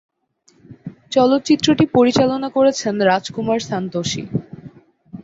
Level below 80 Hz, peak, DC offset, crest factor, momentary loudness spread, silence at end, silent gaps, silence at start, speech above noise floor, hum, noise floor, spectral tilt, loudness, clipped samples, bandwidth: -54 dBFS; -2 dBFS; under 0.1%; 16 dB; 14 LU; 0 s; none; 0.7 s; 42 dB; none; -58 dBFS; -5 dB/octave; -17 LUFS; under 0.1%; 8 kHz